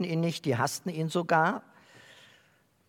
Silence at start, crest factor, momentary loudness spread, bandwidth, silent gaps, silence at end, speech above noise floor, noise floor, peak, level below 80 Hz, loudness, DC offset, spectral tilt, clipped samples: 0 s; 20 dB; 7 LU; 18 kHz; none; 1.3 s; 37 dB; -66 dBFS; -10 dBFS; -78 dBFS; -29 LUFS; under 0.1%; -5.5 dB/octave; under 0.1%